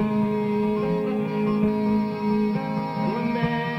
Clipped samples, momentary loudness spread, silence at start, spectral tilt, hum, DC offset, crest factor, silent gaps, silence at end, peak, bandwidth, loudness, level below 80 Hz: under 0.1%; 3 LU; 0 s; -8.5 dB/octave; none; under 0.1%; 12 dB; none; 0 s; -10 dBFS; 6 kHz; -24 LUFS; -52 dBFS